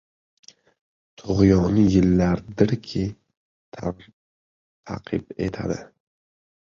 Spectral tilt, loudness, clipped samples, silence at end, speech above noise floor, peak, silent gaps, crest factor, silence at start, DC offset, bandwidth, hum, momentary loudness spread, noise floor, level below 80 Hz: -8 dB/octave; -22 LUFS; under 0.1%; 0.9 s; over 69 dB; -2 dBFS; 3.37-3.72 s, 4.13-4.83 s; 22 dB; 1.25 s; under 0.1%; 7.4 kHz; none; 16 LU; under -90 dBFS; -42 dBFS